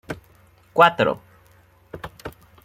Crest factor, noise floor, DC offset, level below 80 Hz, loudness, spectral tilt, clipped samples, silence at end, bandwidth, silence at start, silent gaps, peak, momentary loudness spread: 22 dB; -55 dBFS; under 0.1%; -54 dBFS; -18 LUFS; -5.5 dB/octave; under 0.1%; 0.35 s; 16.5 kHz; 0.1 s; none; -2 dBFS; 24 LU